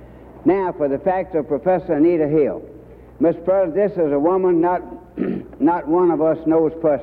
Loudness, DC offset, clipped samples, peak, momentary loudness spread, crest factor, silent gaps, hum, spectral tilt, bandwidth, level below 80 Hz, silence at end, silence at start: -19 LUFS; under 0.1%; under 0.1%; -4 dBFS; 8 LU; 14 dB; none; none; -11 dB/octave; 4.3 kHz; -48 dBFS; 0 s; 0 s